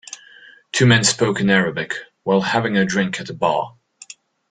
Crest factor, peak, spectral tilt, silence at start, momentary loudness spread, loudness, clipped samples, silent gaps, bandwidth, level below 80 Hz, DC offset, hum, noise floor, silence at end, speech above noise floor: 18 dB; -2 dBFS; -4 dB/octave; 0.1 s; 13 LU; -18 LUFS; under 0.1%; none; 9.4 kHz; -54 dBFS; under 0.1%; none; -46 dBFS; 0.8 s; 29 dB